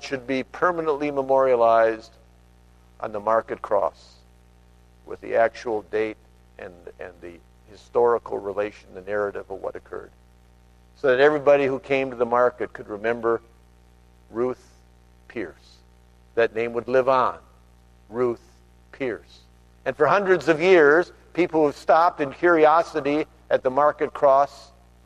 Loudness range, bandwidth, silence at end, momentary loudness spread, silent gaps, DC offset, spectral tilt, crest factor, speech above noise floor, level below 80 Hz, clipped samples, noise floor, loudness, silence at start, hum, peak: 10 LU; 11 kHz; 0.45 s; 19 LU; none; under 0.1%; -6 dB/octave; 18 dB; 32 dB; -54 dBFS; under 0.1%; -53 dBFS; -22 LUFS; 0 s; 60 Hz at -55 dBFS; -4 dBFS